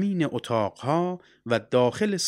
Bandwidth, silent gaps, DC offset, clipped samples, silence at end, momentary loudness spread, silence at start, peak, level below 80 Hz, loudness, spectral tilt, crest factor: 15.5 kHz; none; under 0.1%; under 0.1%; 0 s; 6 LU; 0 s; -8 dBFS; -68 dBFS; -26 LUFS; -5 dB/octave; 18 dB